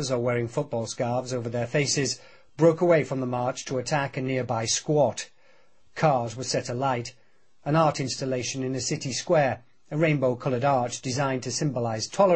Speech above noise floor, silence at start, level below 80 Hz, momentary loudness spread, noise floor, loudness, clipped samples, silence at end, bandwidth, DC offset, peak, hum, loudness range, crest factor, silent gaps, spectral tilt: 37 dB; 0 s; -62 dBFS; 7 LU; -62 dBFS; -26 LUFS; under 0.1%; 0 s; 8.8 kHz; 0.2%; -8 dBFS; none; 2 LU; 18 dB; none; -4.5 dB/octave